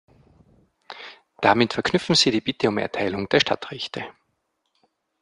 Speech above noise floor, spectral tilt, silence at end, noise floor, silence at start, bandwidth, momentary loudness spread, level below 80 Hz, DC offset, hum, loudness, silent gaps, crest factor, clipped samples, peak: 52 dB; -4 dB/octave; 1.1 s; -74 dBFS; 0.9 s; 11 kHz; 21 LU; -58 dBFS; under 0.1%; none; -22 LUFS; none; 22 dB; under 0.1%; -2 dBFS